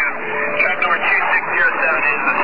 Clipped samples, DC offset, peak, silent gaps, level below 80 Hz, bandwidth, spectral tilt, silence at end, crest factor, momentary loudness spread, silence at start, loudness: under 0.1%; 3%; -4 dBFS; none; -54 dBFS; 5.2 kHz; -6 dB/octave; 0 s; 14 dB; 5 LU; 0 s; -15 LUFS